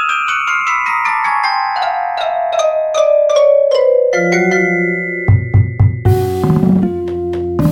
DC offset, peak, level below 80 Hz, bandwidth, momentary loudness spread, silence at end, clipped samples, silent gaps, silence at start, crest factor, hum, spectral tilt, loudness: under 0.1%; 0 dBFS; -34 dBFS; 16.5 kHz; 6 LU; 0 s; under 0.1%; none; 0 s; 12 dB; none; -6.5 dB/octave; -13 LUFS